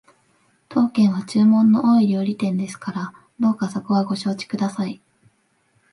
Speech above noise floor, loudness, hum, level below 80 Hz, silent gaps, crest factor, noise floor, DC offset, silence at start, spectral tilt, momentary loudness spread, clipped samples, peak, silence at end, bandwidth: 45 dB; -20 LUFS; none; -68 dBFS; none; 14 dB; -64 dBFS; under 0.1%; 0.7 s; -7 dB/octave; 14 LU; under 0.1%; -6 dBFS; 1 s; 11.5 kHz